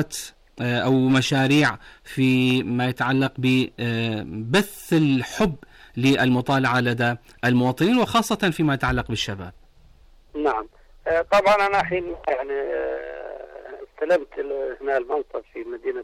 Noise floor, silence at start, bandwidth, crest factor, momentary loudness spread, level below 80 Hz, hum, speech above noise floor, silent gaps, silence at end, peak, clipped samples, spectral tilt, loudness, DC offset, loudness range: -51 dBFS; 0 s; 15.5 kHz; 12 dB; 16 LU; -48 dBFS; none; 29 dB; none; 0 s; -10 dBFS; under 0.1%; -5.5 dB/octave; -22 LUFS; under 0.1%; 5 LU